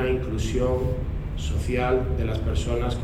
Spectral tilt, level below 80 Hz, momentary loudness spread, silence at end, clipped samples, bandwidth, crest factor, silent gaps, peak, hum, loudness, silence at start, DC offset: -6.5 dB/octave; -30 dBFS; 6 LU; 0 s; under 0.1%; 13.5 kHz; 14 dB; none; -12 dBFS; none; -26 LUFS; 0 s; under 0.1%